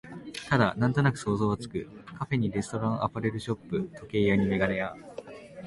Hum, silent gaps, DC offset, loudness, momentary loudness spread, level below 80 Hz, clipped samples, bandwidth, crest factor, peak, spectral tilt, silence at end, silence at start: none; none; under 0.1%; -28 LUFS; 15 LU; -54 dBFS; under 0.1%; 11.5 kHz; 20 dB; -8 dBFS; -7 dB/octave; 0 s; 0.05 s